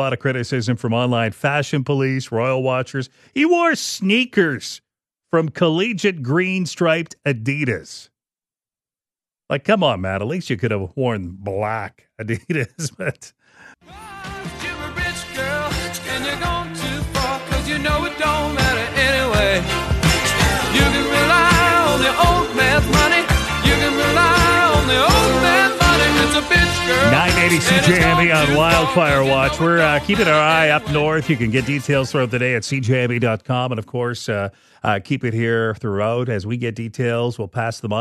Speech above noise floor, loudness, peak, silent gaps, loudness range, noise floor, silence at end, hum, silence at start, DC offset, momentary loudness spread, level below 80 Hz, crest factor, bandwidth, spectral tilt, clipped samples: over 72 dB; -17 LUFS; 0 dBFS; none; 10 LU; under -90 dBFS; 0 s; none; 0 s; under 0.1%; 11 LU; -32 dBFS; 18 dB; 13 kHz; -4.5 dB/octave; under 0.1%